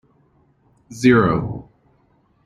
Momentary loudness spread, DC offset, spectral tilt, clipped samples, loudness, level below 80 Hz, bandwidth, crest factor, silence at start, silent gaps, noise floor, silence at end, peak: 21 LU; under 0.1%; -7 dB/octave; under 0.1%; -17 LUFS; -46 dBFS; 11.5 kHz; 20 dB; 0.9 s; none; -60 dBFS; 0.85 s; -2 dBFS